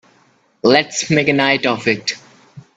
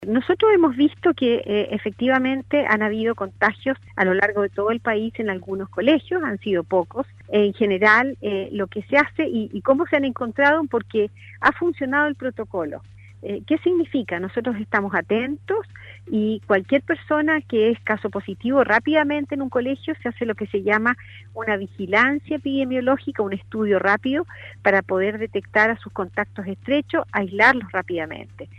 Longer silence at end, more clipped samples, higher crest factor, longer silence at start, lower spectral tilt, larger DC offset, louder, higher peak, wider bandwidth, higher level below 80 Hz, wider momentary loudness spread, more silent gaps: first, 0.15 s vs 0 s; neither; about the same, 18 dB vs 20 dB; first, 0.65 s vs 0 s; second, -4 dB/octave vs -7 dB/octave; neither; first, -15 LUFS vs -21 LUFS; about the same, 0 dBFS vs -2 dBFS; first, 9.2 kHz vs 8.2 kHz; about the same, -56 dBFS vs -56 dBFS; about the same, 8 LU vs 10 LU; neither